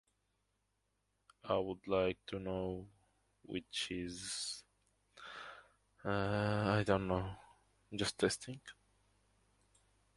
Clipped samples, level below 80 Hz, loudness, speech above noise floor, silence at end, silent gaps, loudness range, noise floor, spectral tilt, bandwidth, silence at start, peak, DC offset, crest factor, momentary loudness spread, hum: under 0.1%; -62 dBFS; -39 LUFS; 45 dB; 1.45 s; none; 6 LU; -83 dBFS; -4.5 dB/octave; 11.5 kHz; 1.45 s; -18 dBFS; under 0.1%; 24 dB; 18 LU; none